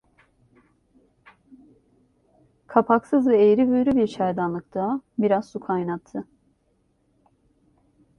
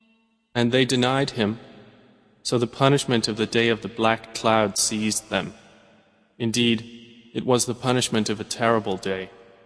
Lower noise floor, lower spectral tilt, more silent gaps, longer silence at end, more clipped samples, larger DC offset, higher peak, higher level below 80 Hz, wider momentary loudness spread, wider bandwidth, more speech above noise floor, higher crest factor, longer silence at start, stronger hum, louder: about the same, -67 dBFS vs -64 dBFS; first, -8.5 dB/octave vs -4 dB/octave; neither; first, 1.95 s vs 0.35 s; neither; neither; about the same, -2 dBFS vs -2 dBFS; about the same, -62 dBFS vs -60 dBFS; about the same, 11 LU vs 10 LU; second, 8.6 kHz vs 11 kHz; first, 46 dB vs 41 dB; about the same, 22 dB vs 22 dB; first, 2.7 s vs 0.55 s; neither; about the same, -22 LUFS vs -23 LUFS